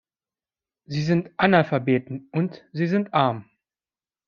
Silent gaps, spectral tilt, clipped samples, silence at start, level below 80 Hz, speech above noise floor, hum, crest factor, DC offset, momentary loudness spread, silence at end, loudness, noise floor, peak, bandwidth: none; -7.5 dB/octave; under 0.1%; 0.9 s; -62 dBFS; over 68 dB; none; 22 dB; under 0.1%; 10 LU; 0.85 s; -23 LUFS; under -90 dBFS; -2 dBFS; 7 kHz